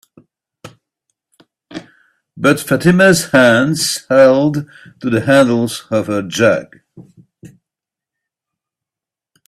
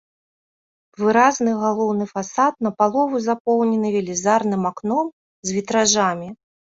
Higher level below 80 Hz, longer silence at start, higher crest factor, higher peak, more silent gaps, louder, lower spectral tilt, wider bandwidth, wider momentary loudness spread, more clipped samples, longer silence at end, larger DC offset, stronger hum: first, -52 dBFS vs -64 dBFS; second, 0.65 s vs 1 s; about the same, 16 dB vs 18 dB; about the same, 0 dBFS vs -2 dBFS; second, none vs 3.40-3.45 s, 5.13-5.43 s; first, -13 LUFS vs -20 LUFS; about the same, -5 dB/octave vs -4 dB/octave; first, 14.5 kHz vs 8 kHz; first, 17 LU vs 9 LU; neither; first, 2 s vs 0.4 s; neither; neither